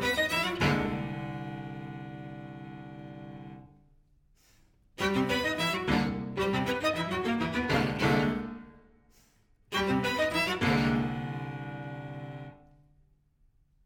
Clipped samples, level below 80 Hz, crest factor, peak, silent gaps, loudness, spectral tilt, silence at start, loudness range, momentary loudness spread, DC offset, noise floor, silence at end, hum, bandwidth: under 0.1%; -52 dBFS; 20 dB; -12 dBFS; none; -30 LUFS; -5.5 dB/octave; 0 s; 12 LU; 18 LU; under 0.1%; -66 dBFS; 1.3 s; none; 18 kHz